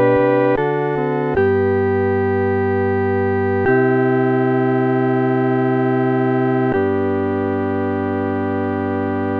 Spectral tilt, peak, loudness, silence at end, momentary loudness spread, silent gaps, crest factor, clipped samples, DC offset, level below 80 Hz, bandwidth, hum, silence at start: -10.5 dB/octave; -4 dBFS; -17 LUFS; 0 s; 5 LU; none; 12 dB; under 0.1%; under 0.1%; -50 dBFS; 4.9 kHz; none; 0 s